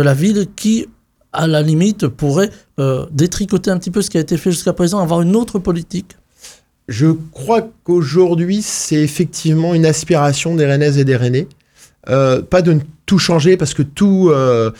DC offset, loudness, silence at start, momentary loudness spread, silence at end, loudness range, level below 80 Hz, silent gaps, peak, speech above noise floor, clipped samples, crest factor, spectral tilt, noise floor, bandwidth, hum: under 0.1%; -14 LUFS; 0 s; 7 LU; 0.05 s; 3 LU; -42 dBFS; none; 0 dBFS; 28 dB; under 0.1%; 14 dB; -6 dB/octave; -42 dBFS; 16 kHz; none